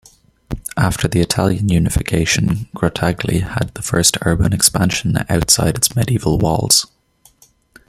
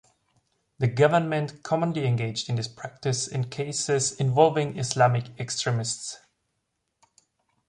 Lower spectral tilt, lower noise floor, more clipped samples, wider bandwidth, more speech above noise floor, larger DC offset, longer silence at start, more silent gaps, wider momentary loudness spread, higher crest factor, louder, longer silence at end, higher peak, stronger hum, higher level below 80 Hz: about the same, -4 dB/octave vs -4.5 dB/octave; second, -54 dBFS vs -78 dBFS; neither; first, 16.5 kHz vs 11 kHz; second, 38 dB vs 53 dB; neither; second, 0.5 s vs 0.8 s; neither; second, 7 LU vs 10 LU; second, 16 dB vs 22 dB; first, -16 LUFS vs -25 LUFS; second, 1.05 s vs 1.5 s; first, 0 dBFS vs -6 dBFS; neither; first, -32 dBFS vs -62 dBFS